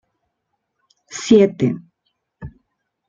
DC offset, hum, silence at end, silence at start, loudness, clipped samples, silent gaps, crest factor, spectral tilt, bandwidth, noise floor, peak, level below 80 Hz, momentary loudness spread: under 0.1%; none; 0.6 s; 1.1 s; -16 LUFS; under 0.1%; none; 20 dB; -6 dB/octave; 7.6 kHz; -75 dBFS; -2 dBFS; -54 dBFS; 26 LU